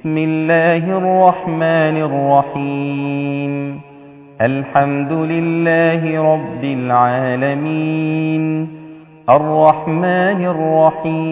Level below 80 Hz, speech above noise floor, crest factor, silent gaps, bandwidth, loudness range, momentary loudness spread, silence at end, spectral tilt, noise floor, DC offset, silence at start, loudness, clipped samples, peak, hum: -58 dBFS; 24 dB; 16 dB; none; 4 kHz; 3 LU; 8 LU; 0 s; -11.5 dB/octave; -39 dBFS; under 0.1%; 0.05 s; -15 LUFS; under 0.1%; 0 dBFS; none